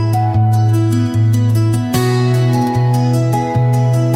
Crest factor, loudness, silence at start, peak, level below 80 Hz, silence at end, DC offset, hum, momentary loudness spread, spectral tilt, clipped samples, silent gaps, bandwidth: 10 dB; -14 LUFS; 0 s; -2 dBFS; -42 dBFS; 0 s; under 0.1%; none; 2 LU; -7.5 dB/octave; under 0.1%; none; 15.5 kHz